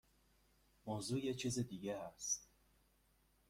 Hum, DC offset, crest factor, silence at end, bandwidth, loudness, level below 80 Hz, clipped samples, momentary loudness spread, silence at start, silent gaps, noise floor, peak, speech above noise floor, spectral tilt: none; under 0.1%; 18 dB; 1.05 s; 16.5 kHz; -43 LUFS; -72 dBFS; under 0.1%; 6 LU; 0.85 s; none; -76 dBFS; -28 dBFS; 33 dB; -4 dB/octave